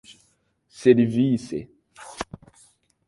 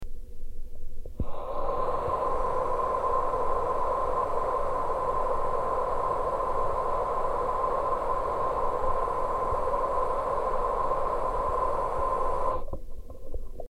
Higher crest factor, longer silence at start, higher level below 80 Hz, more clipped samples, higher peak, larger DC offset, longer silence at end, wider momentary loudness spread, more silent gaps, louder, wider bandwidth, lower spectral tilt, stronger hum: first, 22 dB vs 12 dB; first, 0.8 s vs 0 s; second, -58 dBFS vs -36 dBFS; neither; first, -2 dBFS vs -14 dBFS; neither; first, 0.85 s vs 0.05 s; first, 18 LU vs 15 LU; neither; first, -21 LUFS vs -29 LUFS; first, 11.5 kHz vs 9.8 kHz; about the same, -7 dB/octave vs -6.5 dB/octave; neither